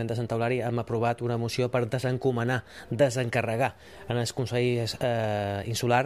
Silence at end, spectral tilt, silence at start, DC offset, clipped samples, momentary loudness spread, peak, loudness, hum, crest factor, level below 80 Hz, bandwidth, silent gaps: 0 s; -6 dB/octave; 0 s; 0.1%; under 0.1%; 5 LU; -10 dBFS; -28 LUFS; none; 18 dB; -58 dBFS; 14.5 kHz; none